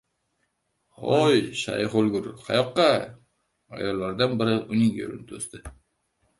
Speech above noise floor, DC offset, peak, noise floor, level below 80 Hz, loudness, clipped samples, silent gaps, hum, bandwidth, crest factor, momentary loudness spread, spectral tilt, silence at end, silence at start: 50 dB; under 0.1%; -6 dBFS; -74 dBFS; -56 dBFS; -24 LUFS; under 0.1%; none; none; 11.5 kHz; 18 dB; 15 LU; -5.5 dB/octave; 0.65 s; 1 s